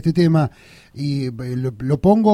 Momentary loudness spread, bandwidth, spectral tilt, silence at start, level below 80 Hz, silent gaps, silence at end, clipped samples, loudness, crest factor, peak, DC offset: 9 LU; 11.5 kHz; -8.5 dB/octave; 0.05 s; -44 dBFS; none; 0 s; under 0.1%; -20 LUFS; 16 dB; -2 dBFS; under 0.1%